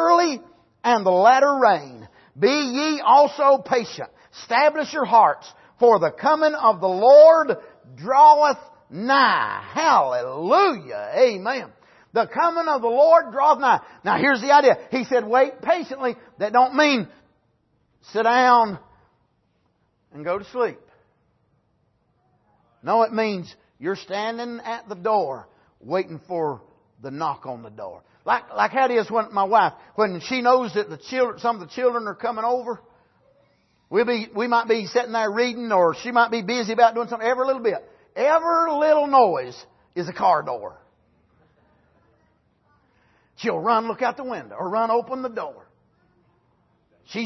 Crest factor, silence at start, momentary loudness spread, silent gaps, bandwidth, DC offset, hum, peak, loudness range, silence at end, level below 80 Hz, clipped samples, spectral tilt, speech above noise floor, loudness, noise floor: 18 dB; 0 s; 16 LU; none; 6.2 kHz; under 0.1%; none; -2 dBFS; 12 LU; 0 s; -70 dBFS; under 0.1%; -4.5 dB/octave; 47 dB; -20 LUFS; -67 dBFS